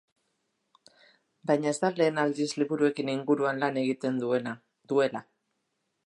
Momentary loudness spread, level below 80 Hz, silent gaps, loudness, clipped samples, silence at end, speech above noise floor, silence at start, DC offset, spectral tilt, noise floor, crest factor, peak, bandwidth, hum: 6 LU; -82 dBFS; none; -28 LUFS; under 0.1%; 0.85 s; 52 dB; 1.45 s; under 0.1%; -5.5 dB/octave; -79 dBFS; 18 dB; -12 dBFS; 11.5 kHz; none